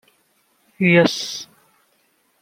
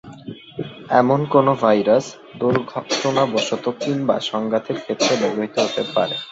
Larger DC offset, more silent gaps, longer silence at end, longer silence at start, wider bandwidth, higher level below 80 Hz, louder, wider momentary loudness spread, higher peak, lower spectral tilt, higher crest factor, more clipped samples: neither; neither; first, 0.95 s vs 0 s; first, 0.8 s vs 0.05 s; first, 16 kHz vs 8 kHz; about the same, -64 dBFS vs -60 dBFS; about the same, -17 LUFS vs -19 LUFS; about the same, 18 LU vs 16 LU; about the same, -2 dBFS vs -2 dBFS; about the same, -5 dB/octave vs -5 dB/octave; about the same, 20 dB vs 18 dB; neither